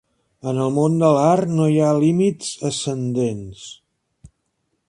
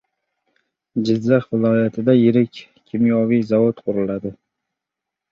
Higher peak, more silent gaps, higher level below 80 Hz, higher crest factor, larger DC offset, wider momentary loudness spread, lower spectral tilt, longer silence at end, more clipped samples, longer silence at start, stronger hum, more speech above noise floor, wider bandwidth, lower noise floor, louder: about the same, -2 dBFS vs -2 dBFS; neither; about the same, -56 dBFS vs -60 dBFS; about the same, 18 dB vs 18 dB; neither; first, 16 LU vs 11 LU; second, -6.5 dB/octave vs -9 dB/octave; first, 1.15 s vs 1 s; neither; second, 0.45 s vs 0.95 s; neither; second, 53 dB vs 67 dB; first, 11.5 kHz vs 6.8 kHz; second, -72 dBFS vs -84 dBFS; about the same, -19 LUFS vs -18 LUFS